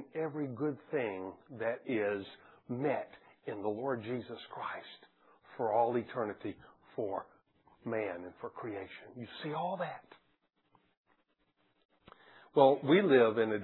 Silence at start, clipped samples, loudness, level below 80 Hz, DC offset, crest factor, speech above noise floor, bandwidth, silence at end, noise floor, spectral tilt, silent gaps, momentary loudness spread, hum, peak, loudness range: 0 s; under 0.1%; -34 LUFS; -80 dBFS; under 0.1%; 24 dB; 43 dB; 4.2 kHz; 0 s; -76 dBFS; -4.5 dB/octave; 10.97-11.04 s, 11.85-11.89 s; 21 LU; none; -12 dBFS; 10 LU